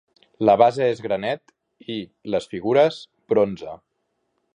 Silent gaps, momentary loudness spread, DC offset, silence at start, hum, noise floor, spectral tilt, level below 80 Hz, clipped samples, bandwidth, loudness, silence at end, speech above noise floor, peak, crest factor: none; 18 LU; under 0.1%; 0.4 s; none; -73 dBFS; -6.5 dB/octave; -62 dBFS; under 0.1%; 10 kHz; -21 LUFS; 0.8 s; 53 dB; -2 dBFS; 20 dB